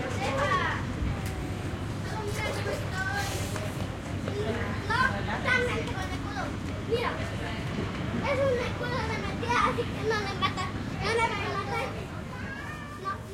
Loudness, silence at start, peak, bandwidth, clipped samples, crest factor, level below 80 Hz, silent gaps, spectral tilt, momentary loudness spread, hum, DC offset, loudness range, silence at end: -30 LUFS; 0 s; -10 dBFS; 16.5 kHz; under 0.1%; 20 dB; -44 dBFS; none; -5 dB/octave; 8 LU; none; under 0.1%; 3 LU; 0 s